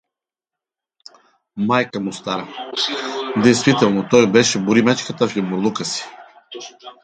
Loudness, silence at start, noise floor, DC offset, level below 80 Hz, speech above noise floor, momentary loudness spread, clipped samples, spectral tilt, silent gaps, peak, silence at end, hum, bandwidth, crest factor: -18 LUFS; 1.55 s; -87 dBFS; under 0.1%; -60 dBFS; 70 dB; 20 LU; under 0.1%; -4.5 dB/octave; none; 0 dBFS; 0.1 s; none; 9.4 kHz; 20 dB